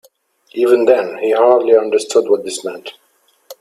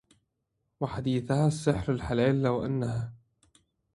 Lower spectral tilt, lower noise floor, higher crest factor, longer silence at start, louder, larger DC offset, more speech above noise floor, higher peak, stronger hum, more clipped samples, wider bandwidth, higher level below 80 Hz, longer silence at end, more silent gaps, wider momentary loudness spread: second, -3.5 dB/octave vs -7 dB/octave; second, -51 dBFS vs -80 dBFS; second, 14 dB vs 20 dB; second, 0.55 s vs 0.8 s; first, -14 LUFS vs -29 LUFS; neither; second, 38 dB vs 52 dB; first, 0 dBFS vs -10 dBFS; neither; neither; first, 14.5 kHz vs 11.5 kHz; second, -66 dBFS vs -50 dBFS; second, 0.1 s vs 0.8 s; neither; first, 16 LU vs 10 LU